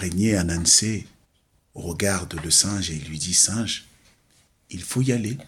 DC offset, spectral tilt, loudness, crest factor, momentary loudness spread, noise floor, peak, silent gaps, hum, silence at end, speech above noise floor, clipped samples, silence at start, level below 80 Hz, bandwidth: under 0.1%; -3 dB/octave; -21 LUFS; 20 dB; 16 LU; -65 dBFS; -4 dBFS; none; none; 0 s; 42 dB; under 0.1%; 0 s; -46 dBFS; 19 kHz